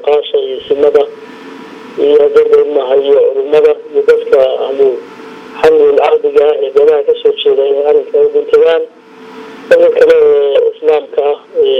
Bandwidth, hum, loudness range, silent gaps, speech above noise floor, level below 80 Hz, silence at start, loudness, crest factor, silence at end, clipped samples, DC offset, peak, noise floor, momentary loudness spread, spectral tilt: 6.4 kHz; none; 1 LU; none; 23 dB; -54 dBFS; 0 s; -9 LUFS; 10 dB; 0 s; 0.6%; under 0.1%; 0 dBFS; -31 dBFS; 18 LU; -4.5 dB/octave